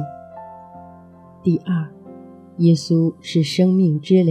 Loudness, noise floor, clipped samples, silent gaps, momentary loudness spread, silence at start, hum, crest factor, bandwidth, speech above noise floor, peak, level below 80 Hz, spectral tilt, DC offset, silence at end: -18 LUFS; -44 dBFS; under 0.1%; none; 23 LU; 0 s; none; 16 dB; 10 kHz; 27 dB; -4 dBFS; -64 dBFS; -7.5 dB/octave; under 0.1%; 0 s